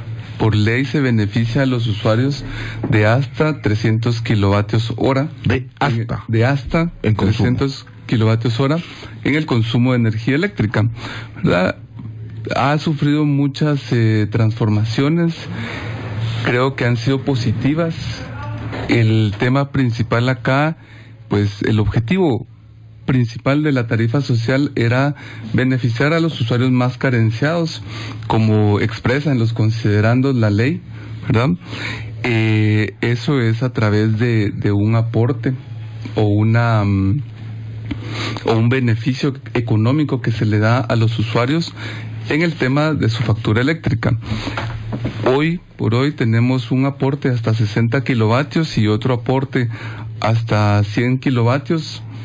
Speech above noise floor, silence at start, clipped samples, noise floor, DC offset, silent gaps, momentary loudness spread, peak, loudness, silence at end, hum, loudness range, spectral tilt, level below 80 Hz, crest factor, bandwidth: 24 dB; 0 s; under 0.1%; -40 dBFS; under 0.1%; none; 10 LU; -4 dBFS; -17 LUFS; 0 s; none; 2 LU; -7.5 dB/octave; -40 dBFS; 12 dB; 7.8 kHz